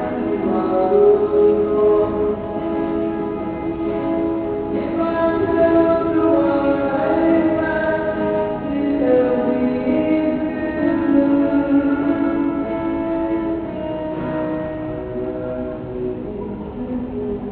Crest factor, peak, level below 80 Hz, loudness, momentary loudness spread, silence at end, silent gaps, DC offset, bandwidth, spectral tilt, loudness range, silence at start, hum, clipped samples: 14 dB; -4 dBFS; -42 dBFS; -19 LUFS; 10 LU; 0 s; none; under 0.1%; 4.5 kHz; -6.5 dB/octave; 7 LU; 0 s; none; under 0.1%